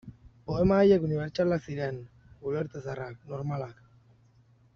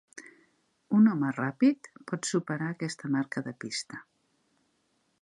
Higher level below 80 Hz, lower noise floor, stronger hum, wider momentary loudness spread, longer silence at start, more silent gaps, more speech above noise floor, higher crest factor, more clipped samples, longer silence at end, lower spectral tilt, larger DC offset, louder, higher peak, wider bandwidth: first, -52 dBFS vs -80 dBFS; second, -61 dBFS vs -74 dBFS; neither; about the same, 18 LU vs 17 LU; about the same, 0.05 s vs 0.15 s; neither; second, 34 dB vs 43 dB; about the same, 18 dB vs 18 dB; neither; second, 1.05 s vs 1.2 s; first, -7 dB/octave vs -5.5 dB/octave; neither; about the same, -29 LUFS vs -29 LUFS; about the same, -12 dBFS vs -14 dBFS; second, 6.8 kHz vs 11 kHz